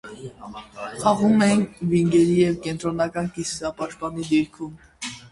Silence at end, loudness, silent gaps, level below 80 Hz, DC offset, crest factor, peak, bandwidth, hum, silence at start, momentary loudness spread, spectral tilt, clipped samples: 0.05 s; -22 LUFS; none; -52 dBFS; under 0.1%; 18 dB; -4 dBFS; 11.5 kHz; none; 0.05 s; 19 LU; -6 dB/octave; under 0.1%